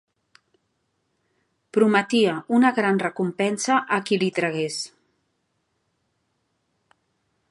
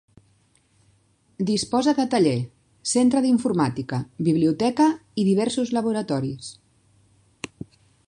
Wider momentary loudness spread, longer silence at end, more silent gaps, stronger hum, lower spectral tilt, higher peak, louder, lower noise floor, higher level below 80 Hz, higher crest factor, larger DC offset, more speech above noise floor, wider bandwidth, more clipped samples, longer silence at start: second, 8 LU vs 17 LU; first, 2.65 s vs 1.55 s; neither; neither; about the same, -4.5 dB/octave vs -5.5 dB/octave; first, -4 dBFS vs -8 dBFS; about the same, -22 LUFS vs -22 LUFS; first, -73 dBFS vs -62 dBFS; second, -76 dBFS vs -60 dBFS; about the same, 20 dB vs 16 dB; neither; first, 52 dB vs 41 dB; about the same, 11.5 kHz vs 11 kHz; neither; first, 1.75 s vs 1.4 s